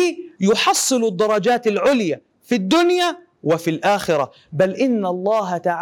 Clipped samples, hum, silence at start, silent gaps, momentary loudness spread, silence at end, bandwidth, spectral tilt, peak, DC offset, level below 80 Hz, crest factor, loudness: under 0.1%; none; 0 s; none; 7 LU; 0 s; 18.5 kHz; -4 dB/octave; -4 dBFS; under 0.1%; -60 dBFS; 14 dB; -19 LUFS